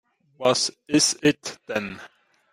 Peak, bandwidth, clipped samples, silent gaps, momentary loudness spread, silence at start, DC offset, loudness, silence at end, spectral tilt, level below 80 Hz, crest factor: -6 dBFS; 16 kHz; under 0.1%; none; 13 LU; 0.4 s; under 0.1%; -23 LUFS; 0.45 s; -3 dB/octave; -64 dBFS; 20 dB